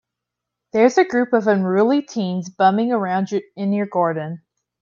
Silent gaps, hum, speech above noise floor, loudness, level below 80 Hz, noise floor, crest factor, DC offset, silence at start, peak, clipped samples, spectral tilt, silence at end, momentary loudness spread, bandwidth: none; none; 64 dB; -19 LUFS; -68 dBFS; -82 dBFS; 18 dB; under 0.1%; 0.75 s; -2 dBFS; under 0.1%; -6.5 dB/octave; 0.45 s; 9 LU; 7.4 kHz